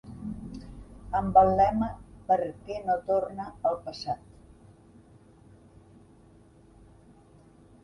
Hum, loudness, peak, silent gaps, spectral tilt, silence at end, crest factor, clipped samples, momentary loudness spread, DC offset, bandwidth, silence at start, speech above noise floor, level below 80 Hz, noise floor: none; -28 LUFS; -8 dBFS; none; -7.5 dB/octave; 3.7 s; 22 dB; under 0.1%; 22 LU; under 0.1%; 11 kHz; 0.05 s; 30 dB; -50 dBFS; -56 dBFS